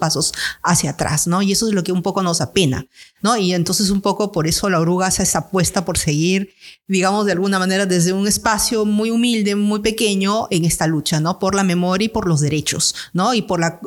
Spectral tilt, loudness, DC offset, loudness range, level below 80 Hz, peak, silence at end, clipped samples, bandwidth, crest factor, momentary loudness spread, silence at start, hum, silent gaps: -4 dB/octave; -17 LUFS; under 0.1%; 1 LU; -42 dBFS; -2 dBFS; 0 s; under 0.1%; 18.5 kHz; 16 dB; 3 LU; 0 s; none; none